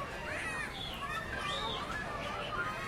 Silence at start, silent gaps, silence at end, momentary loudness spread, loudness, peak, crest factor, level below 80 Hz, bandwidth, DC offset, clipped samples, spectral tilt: 0 s; none; 0 s; 3 LU; -37 LUFS; -26 dBFS; 14 dB; -52 dBFS; 16.5 kHz; under 0.1%; under 0.1%; -3.5 dB/octave